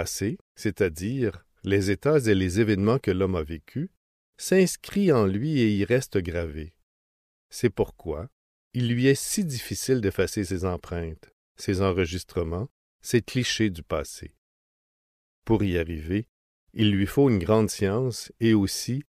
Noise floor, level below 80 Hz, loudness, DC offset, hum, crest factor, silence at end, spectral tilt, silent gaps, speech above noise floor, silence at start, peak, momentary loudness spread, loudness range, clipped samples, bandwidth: under -90 dBFS; -48 dBFS; -26 LUFS; under 0.1%; none; 18 dB; 0.1 s; -5.5 dB/octave; 0.41-0.55 s, 3.97-4.33 s, 6.83-7.50 s, 8.32-8.71 s, 11.33-11.55 s, 12.71-12.99 s, 14.38-15.42 s, 16.29-16.67 s; over 65 dB; 0 s; -8 dBFS; 13 LU; 5 LU; under 0.1%; 15.5 kHz